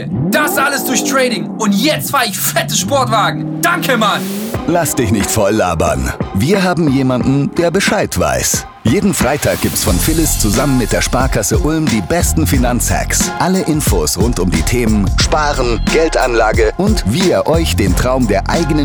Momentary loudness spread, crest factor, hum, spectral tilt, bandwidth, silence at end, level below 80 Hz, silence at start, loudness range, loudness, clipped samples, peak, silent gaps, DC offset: 3 LU; 10 dB; none; -4.5 dB/octave; over 20 kHz; 0 s; -24 dBFS; 0 s; 1 LU; -13 LUFS; under 0.1%; -2 dBFS; none; under 0.1%